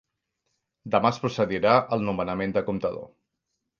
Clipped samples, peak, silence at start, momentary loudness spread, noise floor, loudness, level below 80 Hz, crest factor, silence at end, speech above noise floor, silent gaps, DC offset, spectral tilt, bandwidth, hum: under 0.1%; -4 dBFS; 0.85 s; 10 LU; -81 dBFS; -25 LUFS; -56 dBFS; 22 dB; 0.75 s; 56 dB; none; under 0.1%; -6.5 dB/octave; 7.2 kHz; none